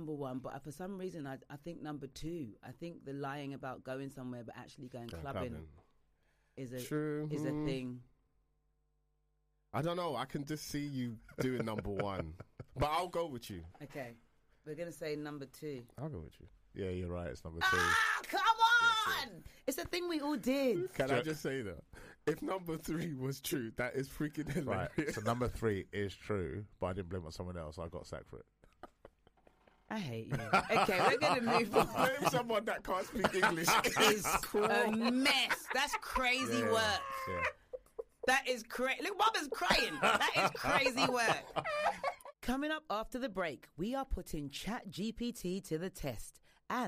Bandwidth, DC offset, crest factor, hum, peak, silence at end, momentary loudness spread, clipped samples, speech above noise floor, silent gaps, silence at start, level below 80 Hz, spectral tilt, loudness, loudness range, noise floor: 15.5 kHz; under 0.1%; 22 dB; none; -14 dBFS; 0 s; 17 LU; under 0.1%; 42 dB; none; 0 s; -56 dBFS; -4 dB/octave; -35 LUFS; 13 LU; -79 dBFS